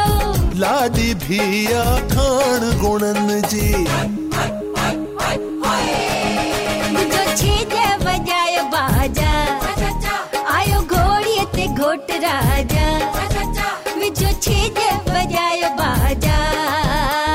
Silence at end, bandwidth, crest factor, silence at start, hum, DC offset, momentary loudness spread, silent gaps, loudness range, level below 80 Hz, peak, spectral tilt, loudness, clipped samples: 0 s; 16.5 kHz; 10 dB; 0 s; none; 0.2%; 5 LU; none; 2 LU; -26 dBFS; -6 dBFS; -4.5 dB/octave; -18 LUFS; under 0.1%